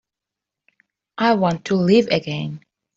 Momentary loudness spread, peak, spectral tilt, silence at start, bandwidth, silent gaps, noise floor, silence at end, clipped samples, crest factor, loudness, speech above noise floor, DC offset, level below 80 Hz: 18 LU; -4 dBFS; -6.5 dB/octave; 1.2 s; 7.8 kHz; none; -86 dBFS; 0.4 s; under 0.1%; 18 dB; -19 LUFS; 68 dB; under 0.1%; -60 dBFS